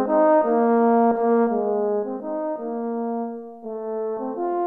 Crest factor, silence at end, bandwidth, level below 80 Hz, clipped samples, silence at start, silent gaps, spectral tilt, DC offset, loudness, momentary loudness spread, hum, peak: 14 dB; 0 s; 3.3 kHz; -68 dBFS; under 0.1%; 0 s; none; -10.5 dB/octave; under 0.1%; -22 LUFS; 12 LU; none; -6 dBFS